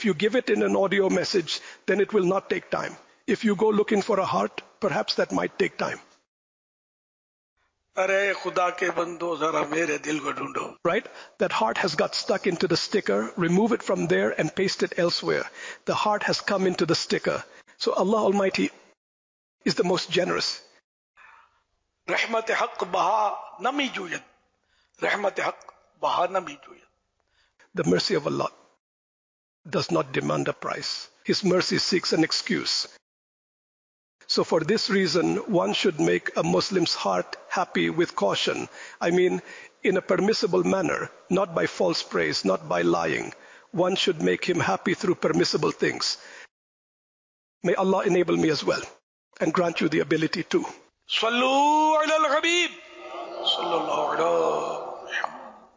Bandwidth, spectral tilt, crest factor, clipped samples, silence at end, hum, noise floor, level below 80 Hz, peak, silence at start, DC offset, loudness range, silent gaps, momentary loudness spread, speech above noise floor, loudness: 7.6 kHz; -4.5 dB/octave; 14 dB; under 0.1%; 0.15 s; none; -73 dBFS; -66 dBFS; -12 dBFS; 0 s; under 0.1%; 5 LU; 6.27-7.56 s, 18.97-19.58 s, 20.84-21.14 s, 28.80-29.64 s, 33.02-34.19 s, 46.51-47.61 s, 49.03-49.31 s; 8 LU; 48 dB; -25 LUFS